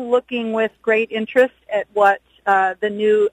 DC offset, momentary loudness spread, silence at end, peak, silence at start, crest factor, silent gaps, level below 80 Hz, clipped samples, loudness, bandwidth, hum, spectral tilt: under 0.1%; 6 LU; 0.05 s; -2 dBFS; 0 s; 16 dB; none; -64 dBFS; under 0.1%; -19 LUFS; 9.4 kHz; none; -5.5 dB/octave